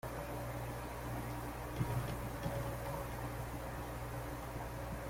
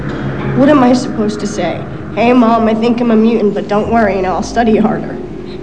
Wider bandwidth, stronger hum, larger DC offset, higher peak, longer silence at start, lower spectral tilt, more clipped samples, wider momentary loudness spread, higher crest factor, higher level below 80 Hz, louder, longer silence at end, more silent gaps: first, 16.5 kHz vs 9.2 kHz; neither; second, under 0.1% vs 2%; second, -26 dBFS vs -2 dBFS; about the same, 0.05 s vs 0 s; about the same, -6 dB/octave vs -6.5 dB/octave; neither; second, 5 LU vs 11 LU; first, 16 dB vs 10 dB; second, -50 dBFS vs -36 dBFS; second, -43 LUFS vs -12 LUFS; about the same, 0 s vs 0 s; neither